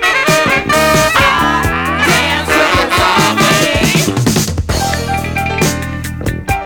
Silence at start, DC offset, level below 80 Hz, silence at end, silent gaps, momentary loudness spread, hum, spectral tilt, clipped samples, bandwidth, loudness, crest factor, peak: 0 s; under 0.1%; -28 dBFS; 0 s; none; 7 LU; none; -3.5 dB/octave; under 0.1%; over 20 kHz; -11 LUFS; 10 dB; -2 dBFS